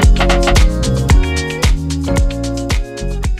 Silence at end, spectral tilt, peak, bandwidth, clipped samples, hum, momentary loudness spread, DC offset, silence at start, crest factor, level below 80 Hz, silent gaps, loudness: 0 s; -5 dB/octave; 0 dBFS; 13.5 kHz; under 0.1%; none; 8 LU; under 0.1%; 0 s; 12 dB; -14 dBFS; none; -15 LUFS